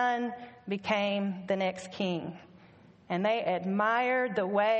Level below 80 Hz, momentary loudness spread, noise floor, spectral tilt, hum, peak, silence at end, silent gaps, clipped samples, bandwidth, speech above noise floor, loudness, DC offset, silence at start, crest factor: -74 dBFS; 10 LU; -57 dBFS; -6 dB/octave; none; -14 dBFS; 0 s; none; under 0.1%; 8.2 kHz; 27 dB; -30 LUFS; under 0.1%; 0 s; 16 dB